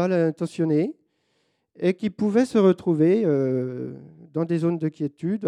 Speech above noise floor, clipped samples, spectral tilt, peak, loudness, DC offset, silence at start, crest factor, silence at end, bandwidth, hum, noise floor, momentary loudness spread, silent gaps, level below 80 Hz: 48 dB; under 0.1%; -8.5 dB/octave; -6 dBFS; -23 LUFS; under 0.1%; 0 s; 16 dB; 0 s; 11 kHz; none; -70 dBFS; 11 LU; none; -72 dBFS